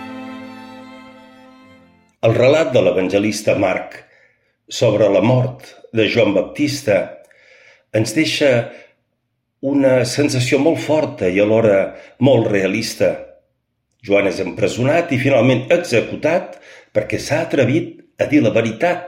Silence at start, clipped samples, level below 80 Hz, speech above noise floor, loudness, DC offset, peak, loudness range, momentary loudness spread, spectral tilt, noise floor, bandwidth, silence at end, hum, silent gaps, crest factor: 0 s; under 0.1%; -54 dBFS; 55 dB; -16 LUFS; under 0.1%; -2 dBFS; 3 LU; 14 LU; -5.5 dB/octave; -71 dBFS; 16 kHz; 0 s; none; none; 16 dB